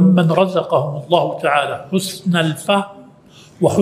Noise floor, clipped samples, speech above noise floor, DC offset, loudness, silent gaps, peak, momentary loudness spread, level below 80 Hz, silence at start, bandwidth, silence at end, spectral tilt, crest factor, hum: -45 dBFS; under 0.1%; 28 dB; under 0.1%; -17 LUFS; none; 0 dBFS; 6 LU; -60 dBFS; 0 s; 15.5 kHz; 0 s; -6 dB/octave; 16 dB; none